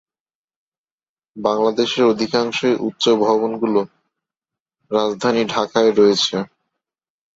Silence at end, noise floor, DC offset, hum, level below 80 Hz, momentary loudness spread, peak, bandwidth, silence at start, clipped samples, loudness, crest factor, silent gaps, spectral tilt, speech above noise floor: 0.9 s; under -90 dBFS; under 0.1%; none; -62 dBFS; 8 LU; -2 dBFS; 7.8 kHz; 1.35 s; under 0.1%; -18 LUFS; 18 dB; 4.60-4.66 s; -4.5 dB/octave; over 73 dB